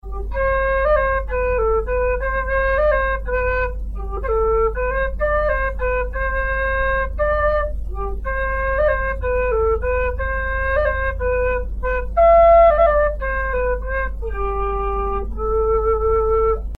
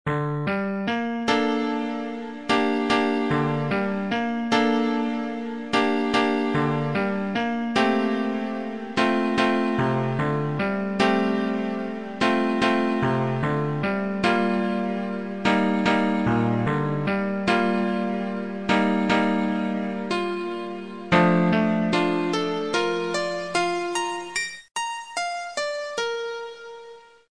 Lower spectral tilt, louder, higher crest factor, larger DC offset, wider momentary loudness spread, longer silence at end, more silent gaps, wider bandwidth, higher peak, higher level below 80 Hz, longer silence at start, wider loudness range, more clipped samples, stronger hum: first, -8 dB/octave vs -6 dB/octave; first, -19 LUFS vs -24 LUFS; about the same, 16 dB vs 18 dB; second, under 0.1% vs 0.4%; about the same, 8 LU vs 8 LU; second, 0 s vs 0.15 s; neither; second, 4.5 kHz vs 10.5 kHz; about the same, -4 dBFS vs -6 dBFS; first, -26 dBFS vs -56 dBFS; about the same, 0.05 s vs 0.05 s; first, 5 LU vs 2 LU; neither; neither